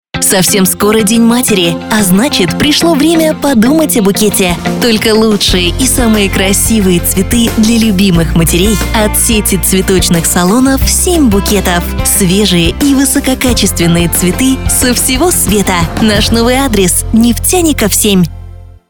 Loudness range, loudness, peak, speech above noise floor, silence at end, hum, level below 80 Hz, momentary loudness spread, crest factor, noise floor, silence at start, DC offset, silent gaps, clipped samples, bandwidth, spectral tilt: 0 LU; -8 LUFS; 0 dBFS; 20 dB; 0.15 s; none; -20 dBFS; 2 LU; 8 dB; -28 dBFS; 0.15 s; under 0.1%; none; under 0.1%; over 20 kHz; -4 dB/octave